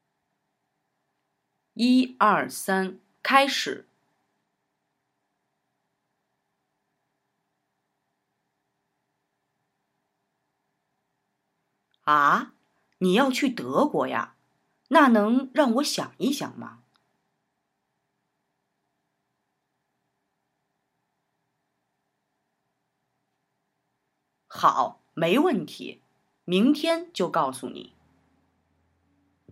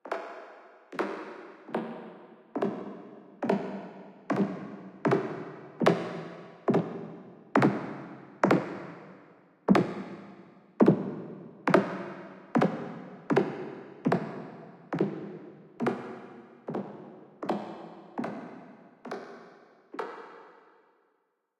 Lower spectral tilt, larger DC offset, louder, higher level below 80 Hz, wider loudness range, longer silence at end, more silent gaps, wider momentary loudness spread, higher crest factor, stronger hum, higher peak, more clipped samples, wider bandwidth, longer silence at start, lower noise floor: second, -4.5 dB/octave vs -7.5 dB/octave; neither; first, -23 LUFS vs -31 LUFS; second, -84 dBFS vs -74 dBFS; second, 7 LU vs 11 LU; first, 1.7 s vs 1.1 s; neither; second, 19 LU vs 22 LU; about the same, 26 dB vs 26 dB; neither; about the same, -4 dBFS vs -6 dBFS; neither; first, 16 kHz vs 11 kHz; first, 1.75 s vs 0.05 s; about the same, -78 dBFS vs -76 dBFS